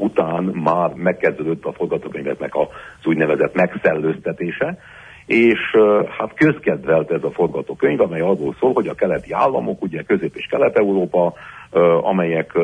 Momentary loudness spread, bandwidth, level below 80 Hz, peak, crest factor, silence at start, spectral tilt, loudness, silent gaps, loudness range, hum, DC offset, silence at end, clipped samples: 9 LU; 9.6 kHz; -54 dBFS; -2 dBFS; 16 dB; 0 s; -8 dB/octave; -18 LUFS; none; 3 LU; none; under 0.1%; 0 s; under 0.1%